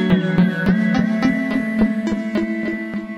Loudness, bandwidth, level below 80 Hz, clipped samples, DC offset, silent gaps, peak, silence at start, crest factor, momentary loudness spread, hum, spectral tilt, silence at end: -19 LUFS; 11.5 kHz; -42 dBFS; under 0.1%; under 0.1%; none; -4 dBFS; 0 s; 14 dB; 6 LU; none; -8 dB/octave; 0 s